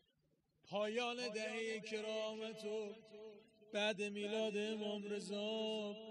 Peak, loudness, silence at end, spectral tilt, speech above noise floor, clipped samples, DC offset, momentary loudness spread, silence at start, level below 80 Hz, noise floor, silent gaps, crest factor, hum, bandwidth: -26 dBFS; -43 LUFS; 0 s; -4 dB/octave; 38 dB; under 0.1%; under 0.1%; 7 LU; 0.65 s; -90 dBFS; -81 dBFS; none; 18 dB; none; 10.5 kHz